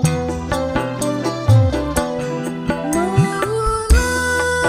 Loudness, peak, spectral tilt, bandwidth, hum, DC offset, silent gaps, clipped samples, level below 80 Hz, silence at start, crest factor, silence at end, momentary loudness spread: -18 LUFS; -4 dBFS; -5.5 dB/octave; 15.5 kHz; none; under 0.1%; none; under 0.1%; -26 dBFS; 0 s; 14 dB; 0 s; 8 LU